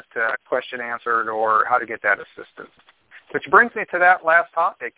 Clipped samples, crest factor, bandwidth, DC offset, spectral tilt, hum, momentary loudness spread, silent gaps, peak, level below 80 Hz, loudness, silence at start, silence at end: under 0.1%; 20 dB; 4 kHz; under 0.1%; -7 dB/octave; none; 13 LU; none; 0 dBFS; -66 dBFS; -19 LUFS; 0.15 s; 0.1 s